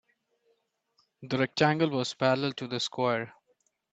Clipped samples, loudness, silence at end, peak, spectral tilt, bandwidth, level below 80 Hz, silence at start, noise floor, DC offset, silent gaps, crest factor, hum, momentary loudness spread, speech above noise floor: under 0.1%; -28 LUFS; 0.65 s; -8 dBFS; -5 dB/octave; 9 kHz; -70 dBFS; 1.2 s; -74 dBFS; under 0.1%; none; 22 dB; none; 8 LU; 46 dB